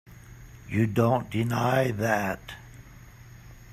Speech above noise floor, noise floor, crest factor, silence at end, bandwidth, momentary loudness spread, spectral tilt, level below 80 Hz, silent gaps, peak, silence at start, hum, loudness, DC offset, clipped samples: 23 dB; -48 dBFS; 18 dB; 0 s; 15 kHz; 20 LU; -6.5 dB/octave; -52 dBFS; none; -10 dBFS; 0.05 s; none; -26 LUFS; under 0.1%; under 0.1%